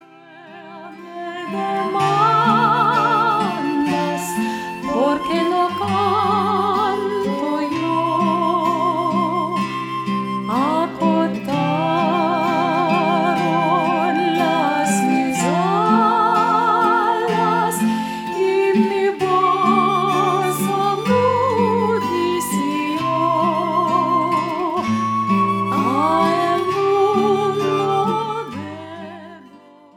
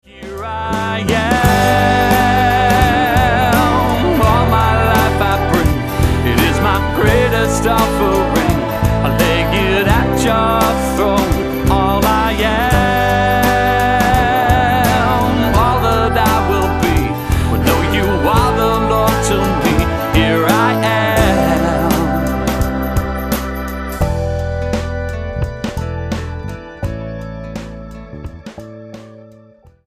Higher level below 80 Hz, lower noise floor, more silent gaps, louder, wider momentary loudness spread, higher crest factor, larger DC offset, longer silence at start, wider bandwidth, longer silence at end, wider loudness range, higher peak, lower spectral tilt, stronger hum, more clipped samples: second, -60 dBFS vs -24 dBFS; about the same, -45 dBFS vs -45 dBFS; neither; second, -18 LUFS vs -14 LUFS; second, 7 LU vs 12 LU; about the same, 14 dB vs 14 dB; neither; first, 0.3 s vs 0.15 s; first, 17.5 kHz vs 15.5 kHz; second, 0.4 s vs 0.65 s; second, 3 LU vs 9 LU; second, -4 dBFS vs 0 dBFS; about the same, -5.5 dB/octave vs -5.5 dB/octave; neither; neither